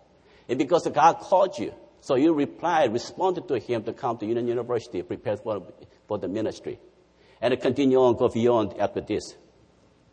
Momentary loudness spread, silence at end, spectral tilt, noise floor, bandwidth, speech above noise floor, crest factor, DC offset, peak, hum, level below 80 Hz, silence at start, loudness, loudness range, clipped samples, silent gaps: 13 LU; 0.8 s; -6 dB/octave; -59 dBFS; 9.4 kHz; 34 dB; 20 dB; under 0.1%; -6 dBFS; none; -62 dBFS; 0.5 s; -25 LUFS; 7 LU; under 0.1%; none